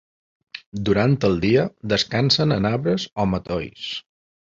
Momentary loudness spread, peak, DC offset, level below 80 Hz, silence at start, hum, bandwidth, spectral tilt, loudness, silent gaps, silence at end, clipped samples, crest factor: 13 LU; -4 dBFS; under 0.1%; -46 dBFS; 0.55 s; none; 7.8 kHz; -6 dB/octave; -21 LUFS; 0.66-0.72 s; 0.6 s; under 0.1%; 18 dB